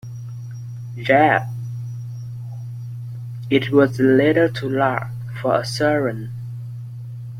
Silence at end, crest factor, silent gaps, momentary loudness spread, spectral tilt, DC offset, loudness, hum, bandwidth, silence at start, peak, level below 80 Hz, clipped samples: 0 s; 18 dB; none; 18 LU; -7 dB/octave; under 0.1%; -19 LUFS; none; 15.5 kHz; 0.05 s; -2 dBFS; -56 dBFS; under 0.1%